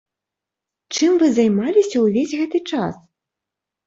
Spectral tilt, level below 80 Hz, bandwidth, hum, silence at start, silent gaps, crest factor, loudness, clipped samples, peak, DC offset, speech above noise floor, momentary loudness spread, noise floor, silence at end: -5 dB/octave; -62 dBFS; 7.8 kHz; none; 0.9 s; none; 16 dB; -18 LUFS; under 0.1%; -4 dBFS; under 0.1%; 68 dB; 9 LU; -85 dBFS; 0.9 s